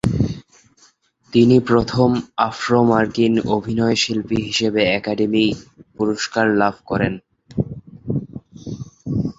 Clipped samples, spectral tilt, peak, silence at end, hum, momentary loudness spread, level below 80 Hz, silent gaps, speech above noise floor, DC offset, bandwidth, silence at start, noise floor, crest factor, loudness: under 0.1%; -6 dB/octave; -2 dBFS; 0.05 s; none; 17 LU; -44 dBFS; none; 38 dB; under 0.1%; 8 kHz; 0.05 s; -56 dBFS; 18 dB; -19 LUFS